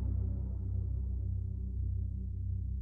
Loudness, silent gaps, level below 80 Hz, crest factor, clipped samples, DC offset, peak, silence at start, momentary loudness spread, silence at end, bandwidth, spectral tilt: -38 LUFS; none; -38 dBFS; 10 dB; under 0.1%; under 0.1%; -26 dBFS; 0 s; 3 LU; 0 s; 1.3 kHz; -13 dB/octave